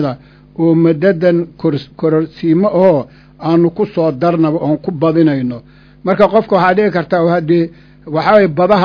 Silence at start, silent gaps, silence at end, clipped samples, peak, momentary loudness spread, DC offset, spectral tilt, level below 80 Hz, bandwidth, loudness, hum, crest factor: 0 s; none; 0 s; 0.2%; 0 dBFS; 11 LU; under 0.1%; -9.5 dB/octave; -48 dBFS; 5.4 kHz; -13 LUFS; none; 12 dB